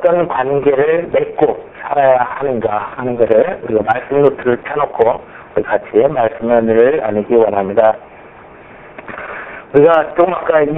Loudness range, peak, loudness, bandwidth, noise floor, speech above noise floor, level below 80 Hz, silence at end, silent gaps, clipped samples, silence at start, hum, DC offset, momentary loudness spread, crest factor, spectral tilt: 1 LU; 0 dBFS; -14 LUFS; 3.9 kHz; -37 dBFS; 24 dB; -48 dBFS; 0 s; none; under 0.1%; 0 s; none; under 0.1%; 12 LU; 14 dB; -9.5 dB/octave